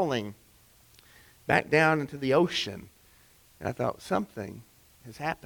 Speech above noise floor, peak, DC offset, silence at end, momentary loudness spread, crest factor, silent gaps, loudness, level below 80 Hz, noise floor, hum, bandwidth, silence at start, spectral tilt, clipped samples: 31 dB; -8 dBFS; under 0.1%; 0.1 s; 19 LU; 22 dB; none; -28 LUFS; -60 dBFS; -59 dBFS; none; over 20 kHz; 0 s; -5.5 dB/octave; under 0.1%